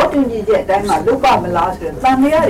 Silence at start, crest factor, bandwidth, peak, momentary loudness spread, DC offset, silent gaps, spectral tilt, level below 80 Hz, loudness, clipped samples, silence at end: 0 s; 8 dB; 16 kHz; -6 dBFS; 5 LU; under 0.1%; none; -5.5 dB/octave; -36 dBFS; -14 LUFS; under 0.1%; 0 s